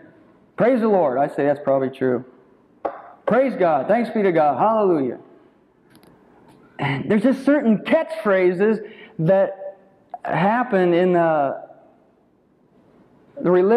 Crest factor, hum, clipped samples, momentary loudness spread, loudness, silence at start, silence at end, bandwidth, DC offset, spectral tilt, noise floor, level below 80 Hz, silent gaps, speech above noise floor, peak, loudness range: 14 dB; none; under 0.1%; 14 LU; -19 LUFS; 0.6 s; 0 s; 11 kHz; under 0.1%; -8.5 dB/octave; -59 dBFS; -68 dBFS; none; 41 dB; -6 dBFS; 2 LU